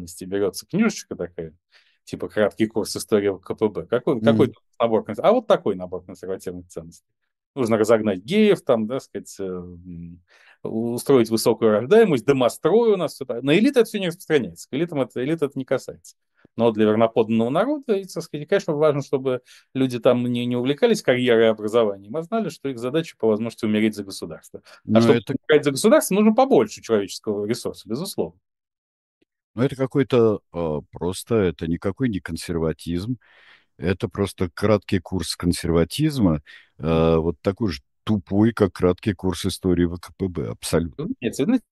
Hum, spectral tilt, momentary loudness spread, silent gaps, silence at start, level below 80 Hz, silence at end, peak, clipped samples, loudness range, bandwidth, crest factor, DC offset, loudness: none; -6 dB/octave; 14 LU; 7.46-7.54 s, 28.78-29.21 s, 29.44-29.54 s; 0 s; -48 dBFS; 0.1 s; -2 dBFS; under 0.1%; 6 LU; 12.5 kHz; 20 dB; under 0.1%; -22 LUFS